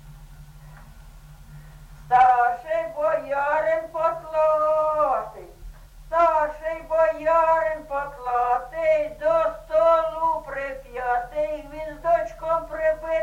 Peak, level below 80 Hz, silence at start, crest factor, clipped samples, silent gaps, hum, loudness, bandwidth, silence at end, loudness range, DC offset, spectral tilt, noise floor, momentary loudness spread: -8 dBFS; -46 dBFS; 0.05 s; 16 dB; under 0.1%; none; none; -23 LUFS; 14.5 kHz; 0 s; 2 LU; under 0.1%; -5.5 dB/octave; -44 dBFS; 10 LU